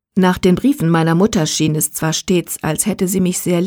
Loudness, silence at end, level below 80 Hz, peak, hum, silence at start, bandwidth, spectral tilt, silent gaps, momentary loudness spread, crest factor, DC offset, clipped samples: -16 LUFS; 0 s; -44 dBFS; -2 dBFS; none; 0.15 s; over 20 kHz; -5 dB/octave; none; 4 LU; 14 dB; under 0.1%; under 0.1%